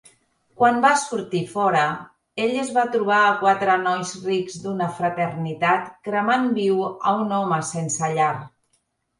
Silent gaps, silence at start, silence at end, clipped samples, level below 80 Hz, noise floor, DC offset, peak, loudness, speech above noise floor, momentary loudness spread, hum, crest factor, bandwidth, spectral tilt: none; 0.6 s; 0.7 s; under 0.1%; -66 dBFS; -69 dBFS; under 0.1%; -4 dBFS; -21 LUFS; 48 dB; 8 LU; none; 18 dB; 11.5 kHz; -4.5 dB/octave